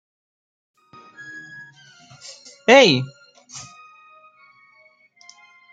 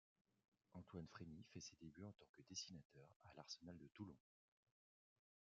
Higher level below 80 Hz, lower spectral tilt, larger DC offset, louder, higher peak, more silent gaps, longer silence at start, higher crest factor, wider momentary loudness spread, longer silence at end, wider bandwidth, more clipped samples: first, -68 dBFS vs -86 dBFS; about the same, -4 dB/octave vs -4.5 dB/octave; neither; first, -14 LUFS vs -59 LUFS; first, -2 dBFS vs -36 dBFS; second, none vs 2.29-2.34 s, 2.85-2.90 s, 3.16-3.20 s; first, 1.35 s vs 0.7 s; about the same, 22 dB vs 24 dB; first, 29 LU vs 11 LU; first, 2.1 s vs 1.3 s; first, 9.2 kHz vs 7.4 kHz; neither